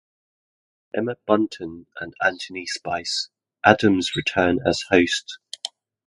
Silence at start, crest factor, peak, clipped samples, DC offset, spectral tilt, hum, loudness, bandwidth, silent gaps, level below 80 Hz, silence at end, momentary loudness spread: 0.95 s; 24 dB; 0 dBFS; under 0.1%; under 0.1%; -4 dB/octave; none; -22 LUFS; 11.5 kHz; none; -52 dBFS; 0.4 s; 16 LU